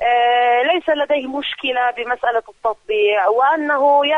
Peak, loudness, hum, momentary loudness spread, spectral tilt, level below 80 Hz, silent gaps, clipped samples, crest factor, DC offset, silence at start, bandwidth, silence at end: -4 dBFS; -17 LUFS; none; 7 LU; -3.5 dB/octave; -58 dBFS; none; under 0.1%; 14 dB; under 0.1%; 0 s; 6.8 kHz; 0 s